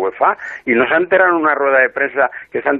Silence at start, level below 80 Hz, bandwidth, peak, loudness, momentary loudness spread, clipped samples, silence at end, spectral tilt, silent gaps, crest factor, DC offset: 0 s; -60 dBFS; 7 kHz; -2 dBFS; -14 LUFS; 6 LU; under 0.1%; 0 s; -6.5 dB/octave; none; 14 dB; under 0.1%